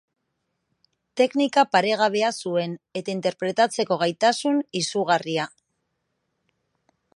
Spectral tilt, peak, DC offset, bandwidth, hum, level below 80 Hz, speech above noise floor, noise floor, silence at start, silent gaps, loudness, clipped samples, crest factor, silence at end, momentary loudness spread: -4 dB/octave; -6 dBFS; under 0.1%; 11.5 kHz; none; -76 dBFS; 54 dB; -77 dBFS; 1.15 s; none; -23 LUFS; under 0.1%; 20 dB; 1.7 s; 9 LU